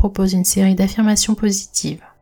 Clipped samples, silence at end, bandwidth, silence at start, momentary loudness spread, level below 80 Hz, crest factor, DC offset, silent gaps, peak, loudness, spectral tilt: under 0.1%; 0.25 s; 18.5 kHz; 0 s; 7 LU; -36 dBFS; 14 dB; under 0.1%; none; -4 dBFS; -16 LUFS; -4.5 dB/octave